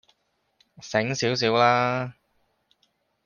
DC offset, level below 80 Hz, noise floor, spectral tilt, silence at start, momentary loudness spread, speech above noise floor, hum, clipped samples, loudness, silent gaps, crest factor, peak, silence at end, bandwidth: under 0.1%; -66 dBFS; -71 dBFS; -4.5 dB/octave; 0.8 s; 14 LU; 48 dB; none; under 0.1%; -23 LUFS; none; 20 dB; -6 dBFS; 1.15 s; 10 kHz